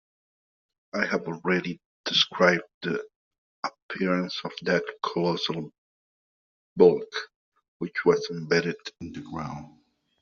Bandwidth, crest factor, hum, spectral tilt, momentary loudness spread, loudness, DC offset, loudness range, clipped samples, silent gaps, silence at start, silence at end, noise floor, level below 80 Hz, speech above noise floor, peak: 7 kHz; 22 dB; none; -3 dB/octave; 17 LU; -26 LUFS; under 0.1%; 4 LU; under 0.1%; 1.85-2.04 s, 2.74-2.81 s, 3.16-3.31 s, 3.38-3.63 s, 3.82-3.89 s, 5.78-6.76 s, 7.36-7.52 s, 7.68-7.80 s; 0.95 s; 0.55 s; under -90 dBFS; -66 dBFS; over 64 dB; -6 dBFS